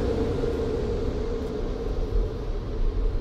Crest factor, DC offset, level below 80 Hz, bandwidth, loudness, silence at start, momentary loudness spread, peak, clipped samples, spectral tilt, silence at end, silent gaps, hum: 12 dB; under 0.1%; -28 dBFS; 7.8 kHz; -29 LUFS; 0 s; 5 LU; -14 dBFS; under 0.1%; -8 dB/octave; 0 s; none; none